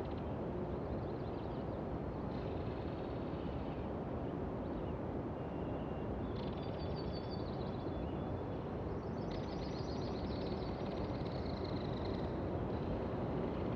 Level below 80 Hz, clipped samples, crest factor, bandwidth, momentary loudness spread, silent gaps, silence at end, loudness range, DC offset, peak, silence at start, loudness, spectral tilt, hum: -50 dBFS; under 0.1%; 14 dB; 7 kHz; 2 LU; none; 0 s; 2 LU; under 0.1%; -28 dBFS; 0 s; -42 LUFS; -8.5 dB/octave; none